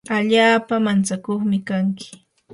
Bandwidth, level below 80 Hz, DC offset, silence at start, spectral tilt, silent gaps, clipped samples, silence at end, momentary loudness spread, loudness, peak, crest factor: 11.5 kHz; -64 dBFS; under 0.1%; 0.1 s; -5 dB/octave; none; under 0.1%; 0.4 s; 10 LU; -19 LUFS; -2 dBFS; 16 dB